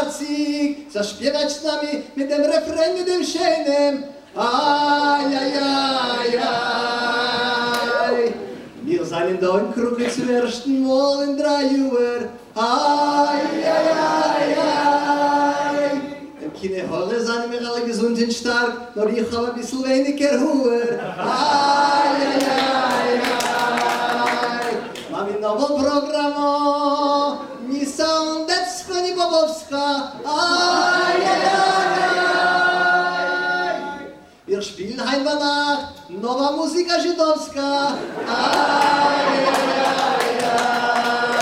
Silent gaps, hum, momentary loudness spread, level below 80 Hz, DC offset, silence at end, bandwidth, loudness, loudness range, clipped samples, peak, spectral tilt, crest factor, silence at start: none; none; 8 LU; -58 dBFS; under 0.1%; 0 s; 16 kHz; -19 LUFS; 4 LU; under 0.1%; -4 dBFS; -3 dB/octave; 16 dB; 0 s